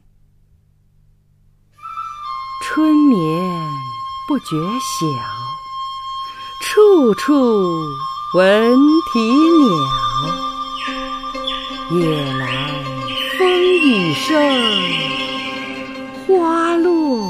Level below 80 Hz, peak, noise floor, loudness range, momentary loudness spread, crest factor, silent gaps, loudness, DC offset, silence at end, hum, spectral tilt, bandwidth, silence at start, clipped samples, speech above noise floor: -46 dBFS; -2 dBFS; -54 dBFS; 7 LU; 15 LU; 16 dB; none; -16 LUFS; under 0.1%; 0 s; 50 Hz at -50 dBFS; -5 dB/octave; 15.5 kHz; 1.85 s; under 0.1%; 39 dB